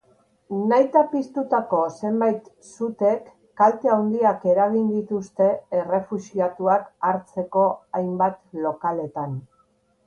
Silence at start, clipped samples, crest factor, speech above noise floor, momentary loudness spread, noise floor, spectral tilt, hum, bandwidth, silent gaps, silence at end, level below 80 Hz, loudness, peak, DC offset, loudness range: 0.5 s; under 0.1%; 18 dB; 42 dB; 10 LU; -63 dBFS; -8 dB/octave; none; 9.6 kHz; none; 0.65 s; -68 dBFS; -23 LUFS; -6 dBFS; under 0.1%; 3 LU